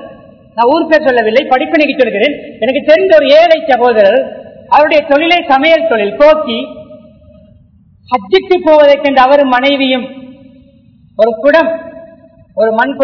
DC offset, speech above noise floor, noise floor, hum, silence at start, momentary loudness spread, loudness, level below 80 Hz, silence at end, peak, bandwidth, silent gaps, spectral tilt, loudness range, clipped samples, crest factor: under 0.1%; 36 dB; -44 dBFS; none; 0 s; 11 LU; -9 LUFS; -46 dBFS; 0 s; 0 dBFS; 5.4 kHz; none; -5.5 dB/octave; 4 LU; 3%; 10 dB